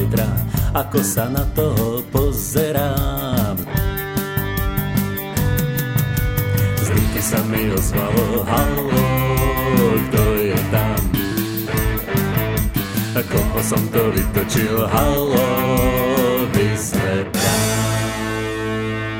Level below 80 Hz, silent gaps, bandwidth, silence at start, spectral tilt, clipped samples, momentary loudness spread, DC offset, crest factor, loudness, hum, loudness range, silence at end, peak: -28 dBFS; none; 17 kHz; 0 s; -5.5 dB/octave; under 0.1%; 4 LU; under 0.1%; 16 dB; -19 LUFS; none; 3 LU; 0 s; -2 dBFS